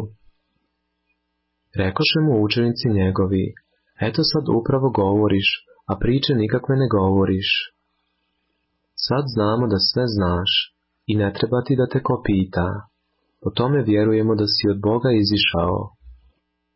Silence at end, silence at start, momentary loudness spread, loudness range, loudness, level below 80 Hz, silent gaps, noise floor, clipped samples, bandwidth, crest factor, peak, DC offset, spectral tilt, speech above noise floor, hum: 0.6 s; 0 s; 9 LU; 2 LU; -20 LUFS; -40 dBFS; none; -74 dBFS; under 0.1%; 5.8 kHz; 14 dB; -8 dBFS; under 0.1%; -9.5 dB/octave; 55 dB; none